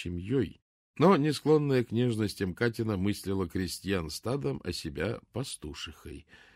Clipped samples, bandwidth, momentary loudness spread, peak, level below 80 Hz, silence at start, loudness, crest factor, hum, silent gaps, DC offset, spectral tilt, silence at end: under 0.1%; 16 kHz; 14 LU; -12 dBFS; -54 dBFS; 0 s; -30 LUFS; 18 dB; none; 0.62-0.94 s; under 0.1%; -6 dB/octave; 0.2 s